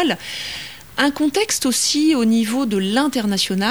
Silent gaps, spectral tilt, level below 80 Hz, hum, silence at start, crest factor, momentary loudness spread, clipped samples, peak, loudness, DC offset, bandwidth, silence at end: none; -3 dB/octave; -54 dBFS; none; 0 s; 18 dB; 11 LU; under 0.1%; -2 dBFS; -18 LUFS; 0.4%; over 20 kHz; 0 s